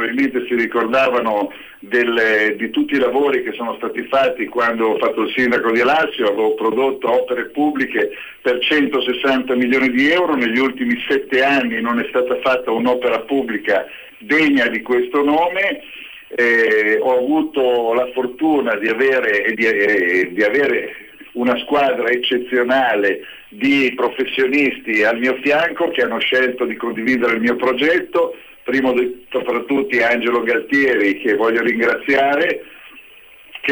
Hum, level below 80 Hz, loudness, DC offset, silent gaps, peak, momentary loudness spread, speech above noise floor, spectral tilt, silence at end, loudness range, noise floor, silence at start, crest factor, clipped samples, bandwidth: none; -56 dBFS; -17 LUFS; under 0.1%; none; -6 dBFS; 7 LU; 26 dB; -5 dB/octave; 0 s; 2 LU; -43 dBFS; 0 s; 10 dB; under 0.1%; over 20 kHz